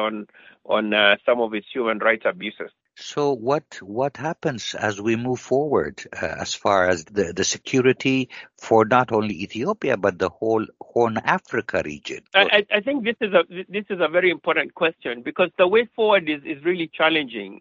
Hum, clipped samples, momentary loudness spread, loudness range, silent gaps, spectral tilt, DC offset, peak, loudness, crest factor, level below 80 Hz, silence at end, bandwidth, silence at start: none; under 0.1%; 12 LU; 4 LU; none; -2.5 dB/octave; under 0.1%; 0 dBFS; -22 LUFS; 22 dB; -60 dBFS; 0.05 s; 7.6 kHz; 0 s